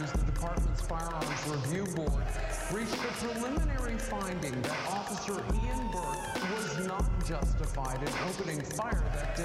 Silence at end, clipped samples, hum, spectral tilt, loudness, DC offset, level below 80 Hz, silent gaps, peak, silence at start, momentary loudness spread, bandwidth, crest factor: 0 s; under 0.1%; none; -5 dB/octave; -34 LUFS; under 0.1%; -36 dBFS; none; -22 dBFS; 0 s; 2 LU; 14.5 kHz; 10 dB